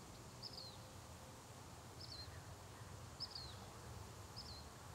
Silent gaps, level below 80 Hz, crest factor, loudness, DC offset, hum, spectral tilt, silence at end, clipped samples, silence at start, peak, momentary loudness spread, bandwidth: none; -66 dBFS; 18 dB; -54 LUFS; under 0.1%; none; -3.5 dB/octave; 0 s; under 0.1%; 0 s; -38 dBFS; 7 LU; 16 kHz